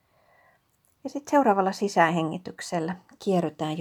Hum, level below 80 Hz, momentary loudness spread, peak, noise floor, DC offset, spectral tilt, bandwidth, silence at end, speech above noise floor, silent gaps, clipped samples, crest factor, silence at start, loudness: none; -72 dBFS; 14 LU; -6 dBFS; -67 dBFS; under 0.1%; -5.5 dB/octave; 18.5 kHz; 0 s; 42 dB; none; under 0.1%; 22 dB; 1.05 s; -26 LUFS